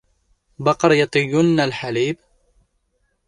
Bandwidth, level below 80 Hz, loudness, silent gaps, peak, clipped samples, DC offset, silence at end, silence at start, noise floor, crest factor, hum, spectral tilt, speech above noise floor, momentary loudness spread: 11 kHz; -56 dBFS; -18 LUFS; none; -2 dBFS; under 0.1%; under 0.1%; 1.15 s; 0.6 s; -68 dBFS; 18 dB; none; -5.5 dB/octave; 50 dB; 8 LU